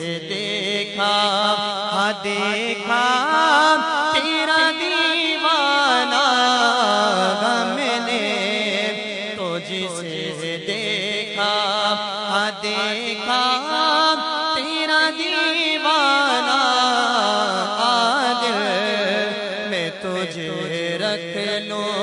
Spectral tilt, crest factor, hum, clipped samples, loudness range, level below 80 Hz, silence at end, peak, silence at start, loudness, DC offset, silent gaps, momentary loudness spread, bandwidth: -2.5 dB/octave; 18 dB; none; under 0.1%; 6 LU; -68 dBFS; 0 s; -2 dBFS; 0 s; -19 LUFS; under 0.1%; none; 9 LU; 11 kHz